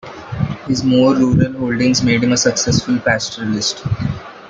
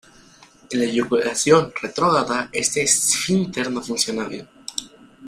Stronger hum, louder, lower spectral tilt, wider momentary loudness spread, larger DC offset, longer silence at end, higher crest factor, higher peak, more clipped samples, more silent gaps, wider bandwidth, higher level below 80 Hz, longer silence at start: neither; first, -16 LUFS vs -20 LUFS; first, -4.5 dB/octave vs -3 dB/octave; second, 10 LU vs 14 LU; neither; about the same, 0 s vs 0 s; second, 14 dB vs 20 dB; about the same, -2 dBFS vs -2 dBFS; neither; neither; second, 9.2 kHz vs 15.5 kHz; first, -40 dBFS vs -58 dBFS; second, 0.05 s vs 0.7 s